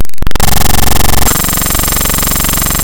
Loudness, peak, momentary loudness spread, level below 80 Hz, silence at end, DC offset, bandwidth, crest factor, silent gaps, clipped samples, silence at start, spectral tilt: -10 LUFS; 0 dBFS; 2 LU; -14 dBFS; 0 s; under 0.1%; over 20 kHz; 8 dB; none; 1%; 0 s; -3 dB/octave